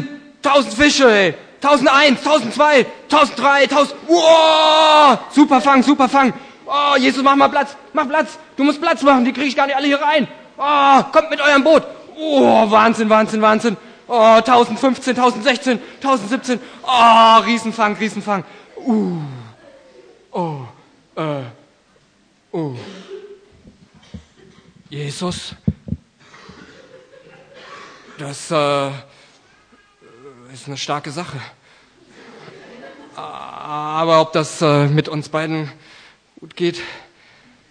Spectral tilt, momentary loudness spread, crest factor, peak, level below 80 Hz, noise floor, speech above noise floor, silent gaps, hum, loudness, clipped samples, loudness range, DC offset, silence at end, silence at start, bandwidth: -4.5 dB/octave; 20 LU; 16 dB; 0 dBFS; -52 dBFS; -56 dBFS; 41 dB; none; none; -14 LUFS; under 0.1%; 18 LU; under 0.1%; 0.7 s; 0 s; 10.5 kHz